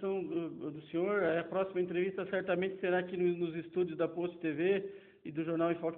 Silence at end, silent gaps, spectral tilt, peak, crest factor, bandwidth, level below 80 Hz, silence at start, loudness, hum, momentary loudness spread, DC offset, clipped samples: 0 s; none; -5.5 dB/octave; -20 dBFS; 16 dB; 4 kHz; -76 dBFS; 0 s; -35 LUFS; none; 7 LU; under 0.1%; under 0.1%